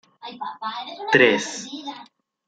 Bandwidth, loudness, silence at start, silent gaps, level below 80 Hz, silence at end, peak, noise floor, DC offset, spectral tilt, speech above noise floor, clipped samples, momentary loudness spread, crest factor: 9.4 kHz; -21 LUFS; 0.2 s; none; -70 dBFS; 0.4 s; -2 dBFS; -49 dBFS; under 0.1%; -3.5 dB/octave; 26 dB; under 0.1%; 21 LU; 22 dB